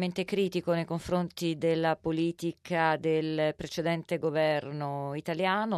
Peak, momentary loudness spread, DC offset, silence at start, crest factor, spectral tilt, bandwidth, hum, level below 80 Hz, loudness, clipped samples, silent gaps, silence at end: -14 dBFS; 6 LU; under 0.1%; 0 s; 16 dB; -6 dB/octave; 14 kHz; none; -62 dBFS; -30 LUFS; under 0.1%; none; 0 s